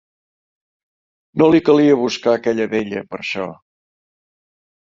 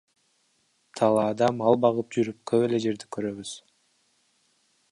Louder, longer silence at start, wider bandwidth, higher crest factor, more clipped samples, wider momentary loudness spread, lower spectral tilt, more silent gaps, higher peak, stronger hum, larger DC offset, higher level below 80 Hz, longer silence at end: first, -17 LUFS vs -25 LUFS; first, 1.35 s vs 0.95 s; second, 7.4 kHz vs 11.5 kHz; about the same, 18 dB vs 20 dB; neither; second, 13 LU vs 16 LU; about the same, -6 dB/octave vs -6 dB/octave; neither; first, -2 dBFS vs -6 dBFS; neither; neither; first, -58 dBFS vs -70 dBFS; about the same, 1.4 s vs 1.35 s